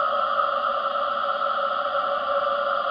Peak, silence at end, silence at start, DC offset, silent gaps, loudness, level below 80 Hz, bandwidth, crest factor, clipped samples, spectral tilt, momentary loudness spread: -10 dBFS; 0 s; 0 s; under 0.1%; none; -24 LUFS; -64 dBFS; 6 kHz; 14 dB; under 0.1%; -4 dB/octave; 2 LU